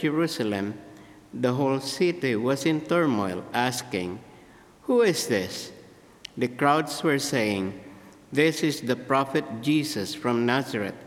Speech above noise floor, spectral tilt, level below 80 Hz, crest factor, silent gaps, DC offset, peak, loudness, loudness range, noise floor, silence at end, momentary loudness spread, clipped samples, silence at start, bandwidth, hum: 26 dB; -5 dB/octave; -68 dBFS; 20 dB; none; under 0.1%; -6 dBFS; -26 LUFS; 2 LU; -52 dBFS; 0 s; 12 LU; under 0.1%; 0 s; 17 kHz; none